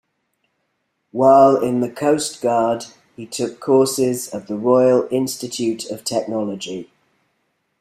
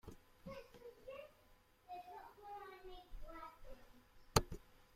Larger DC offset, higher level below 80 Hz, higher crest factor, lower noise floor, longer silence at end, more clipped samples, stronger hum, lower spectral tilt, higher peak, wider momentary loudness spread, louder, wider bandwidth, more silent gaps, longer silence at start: neither; about the same, -62 dBFS vs -58 dBFS; second, 18 dB vs 36 dB; about the same, -71 dBFS vs -70 dBFS; first, 0.95 s vs 0 s; neither; neither; about the same, -5 dB/octave vs -4 dB/octave; first, -2 dBFS vs -12 dBFS; second, 15 LU vs 23 LU; first, -18 LUFS vs -48 LUFS; about the same, 16 kHz vs 16 kHz; neither; first, 1.15 s vs 0.05 s